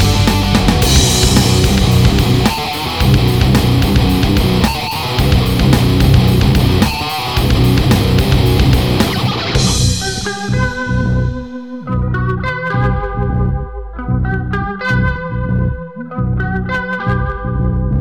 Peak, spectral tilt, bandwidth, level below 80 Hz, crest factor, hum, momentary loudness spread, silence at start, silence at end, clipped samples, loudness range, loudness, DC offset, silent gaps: 0 dBFS; -5 dB/octave; over 20 kHz; -20 dBFS; 12 dB; none; 8 LU; 0 s; 0 s; under 0.1%; 6 LU; -14 LUFS; 0.5%; none